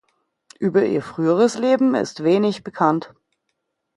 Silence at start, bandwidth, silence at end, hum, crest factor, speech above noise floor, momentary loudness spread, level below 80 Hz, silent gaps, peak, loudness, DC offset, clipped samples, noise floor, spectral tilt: 0.6 s; 11.5 kHz; 0.9 s; none; 18 dB; 57 dB; 5 LU; -66 dBFS; none; -2 dBFS; -19 LUFS; under 0.1%; under 0.1%; -75 dBFS; -6.5 dB/octave